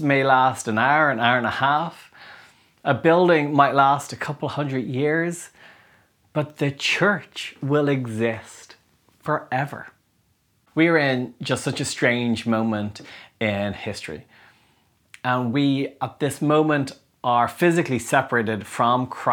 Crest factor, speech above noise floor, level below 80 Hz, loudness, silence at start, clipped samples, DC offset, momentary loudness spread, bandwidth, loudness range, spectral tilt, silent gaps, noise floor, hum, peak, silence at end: 20 dB; 44 dB; -64 dBFS; -22 LUFS; 0 s; under 0.1%; under 0.1%; 13 LU; 19 kHz; 6 LU; -5.5 dB/octave; none; -65 dBFS; none; -2 dBFS; 0 s